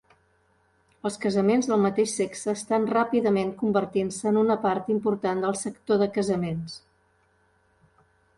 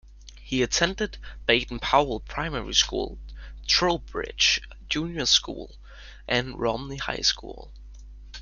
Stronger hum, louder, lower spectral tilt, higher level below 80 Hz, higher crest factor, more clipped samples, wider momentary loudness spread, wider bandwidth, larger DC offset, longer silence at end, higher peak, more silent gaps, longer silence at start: neither; about the same, -25 LUFS vs -25 LUFS; first, -5.5 dB/octave vs -2.5 dB/octave; second, -64 dBFS vs -42 dBFS; second, 16 dB vs 22 dB; neither; second, 9 LU vs 17 LU; about the same, 11.5 kHz vs 11 kHz; neither; first, 1.6 s vs 0 s; second, -10 dBFS vs -4 dBFS; neither; first, 1.05 s vs 0.05 s